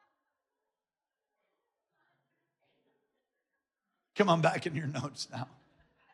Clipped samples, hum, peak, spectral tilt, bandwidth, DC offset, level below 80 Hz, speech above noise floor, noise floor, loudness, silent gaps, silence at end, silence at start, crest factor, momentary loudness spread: under 0.1%; none; -14 dBFS; -5.5 dB/octave; 11.5 kHz; under 0.1%; -82 dBFS; over 59 dB; under -90 dBFS; -31 LUFS; none; 0.7 s; 4.15 s; 24 dB; 17 LU